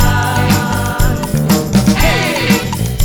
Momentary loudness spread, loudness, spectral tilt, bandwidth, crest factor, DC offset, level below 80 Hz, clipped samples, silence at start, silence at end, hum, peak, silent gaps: 4 LU; -13 LUFS; -5 dB/octave; over 20 kHz; 12 dB; under 0.1%; -20 dBFS; under 0.1%; 0 s; 0 s; none; 0 dBFS; none